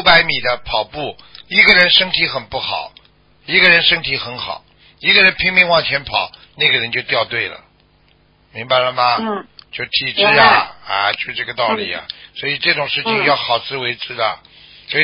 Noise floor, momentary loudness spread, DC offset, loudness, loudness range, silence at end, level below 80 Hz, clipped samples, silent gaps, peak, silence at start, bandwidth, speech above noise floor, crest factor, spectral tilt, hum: -54 dBFS; 17 LU; under 0.1%; -14 LUFS; 6 LU; 0 s; -48 dBFS; under 0.1%; none; 0 dBFS; 0 s; 8 kHz; 38 dB; 16 dB; -5 dB/octave; 50 Hz at -60 dBFS